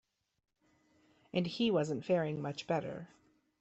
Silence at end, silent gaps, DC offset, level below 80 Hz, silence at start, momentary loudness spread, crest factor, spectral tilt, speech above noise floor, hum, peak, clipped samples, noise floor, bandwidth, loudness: 0.55 s; none; under 0.1%; -74 dBFS; 1.35 s; 13 LU; 18 dB; -6.5 dB/octave; 38 dB; none; -20 dBFS; under 0.1%; -73 dBFS; 8.2 kHz; -35 LUFS